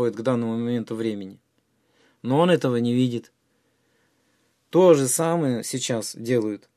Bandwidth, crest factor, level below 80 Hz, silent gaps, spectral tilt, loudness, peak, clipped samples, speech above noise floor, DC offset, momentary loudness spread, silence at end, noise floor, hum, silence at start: 14.5 kHz; 20 dB; -72 dBFS; none; -5.5 dB/octave; -22 LUFS; -4 dBFS; under 0.1%; 46 dB; under 0.1%; 12 LU; 0.2 s; -68 dBFS; none; 0 s